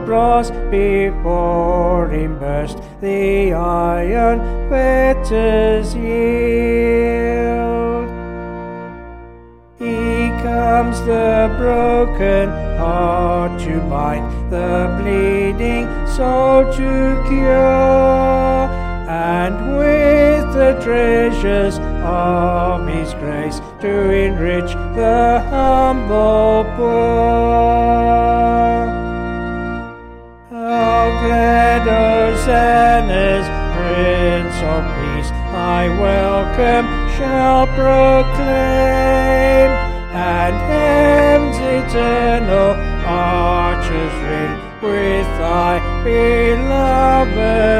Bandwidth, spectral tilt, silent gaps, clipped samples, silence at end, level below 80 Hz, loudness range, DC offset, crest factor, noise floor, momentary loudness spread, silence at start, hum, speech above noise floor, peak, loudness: 13 kHz; -7 dB/octave; none; under 0.1%; 0 s; -22 dBFS; 4 LU; under 0.1%; 14 dB; -40 dBFS; 10 LU; 0 s; none; 27 dB; 0 dBFS; -15 LUFS